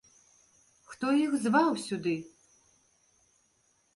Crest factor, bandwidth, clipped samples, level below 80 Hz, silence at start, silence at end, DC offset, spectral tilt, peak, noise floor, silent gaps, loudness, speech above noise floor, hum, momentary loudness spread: 20 dB; 11.5 kHz; under 0.1%; -76 dBFS; 0.9 s; 1.7 s; under 0.1%; -5 dB/octave; -14 dBFS; -71 dBFS; none; -29 LUFS; 43 dB; none; 17 LU